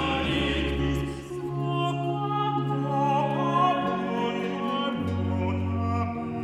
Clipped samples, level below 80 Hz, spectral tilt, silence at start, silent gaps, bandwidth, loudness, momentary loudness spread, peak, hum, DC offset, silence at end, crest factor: under 0.1%; -42 dBFS; -7 dB/octave; 0 s; none; 12.5 kHz; -27 LUFS; 5 LU; -12 dBFS; none; under 0.1%; 0 s; 14 dB